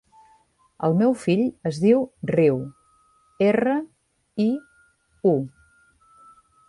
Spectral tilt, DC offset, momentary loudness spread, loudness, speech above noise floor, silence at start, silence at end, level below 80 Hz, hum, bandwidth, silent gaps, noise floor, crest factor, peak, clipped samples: -8 dB/octave; under 0.1%; 12 LU; -22 LUFS; 40 dB; 0.8 s; 1.2 s; -62 dBFS; none; 11.5 kHz; none; -61 dBFS; 16 dB; -6 dBFS; under 0.1%